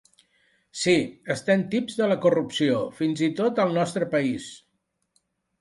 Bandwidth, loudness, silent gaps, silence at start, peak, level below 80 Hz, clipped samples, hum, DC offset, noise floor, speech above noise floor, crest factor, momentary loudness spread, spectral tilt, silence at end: 11.5 kHz; -24 LUFS; none; 0.75 s; -8 dBFS; -66 dBFS; under 0.1%; none; under 0.1%; -75 dBFS; 52 dB; 18 dB; 7 LU; -5.5 dB/octave; 1.05 s